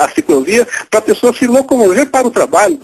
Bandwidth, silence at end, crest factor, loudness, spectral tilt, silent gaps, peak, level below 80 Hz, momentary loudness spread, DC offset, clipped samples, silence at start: 13.5 kHz; 0.05 s; 10 dB; -11 LUFS; -3.5 dB/octave; none; 0 dBFS; -50 dBFS; 3 LU; under 0.1%; 0.2%; 0 s